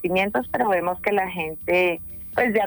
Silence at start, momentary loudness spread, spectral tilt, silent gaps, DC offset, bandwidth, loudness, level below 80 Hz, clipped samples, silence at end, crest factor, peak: 0 s; 7 LU; -7 dB/octave; none; under 0.1%; over 20 kHz; -23 LUFS; -52 dBFS; under 0.1%; 0 s; 14 dB; -8 dBFS